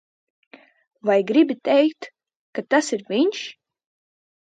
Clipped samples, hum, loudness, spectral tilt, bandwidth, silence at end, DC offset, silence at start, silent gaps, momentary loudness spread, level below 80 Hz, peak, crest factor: under 0.1%; none; -20 LUFS; -4 dB/octave; 9.4 kHz; 0.9 s; under 0.1%; 1.05 s; 2.36-2.53 s; 16 LU; -78 dBFS; -6 dBFS; 18 dB